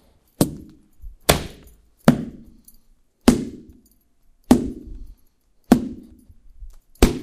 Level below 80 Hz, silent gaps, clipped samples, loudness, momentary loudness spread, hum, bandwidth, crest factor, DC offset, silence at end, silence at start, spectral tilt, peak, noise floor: -34 dBFS; none; under 0.1%; -21 LUFS; 20 LU; none; 15.5 kHz; 24 dB; under 0.1%; 0 s; 0.4 s; -5 dB/octave; 0 dBFS; -58 dBFS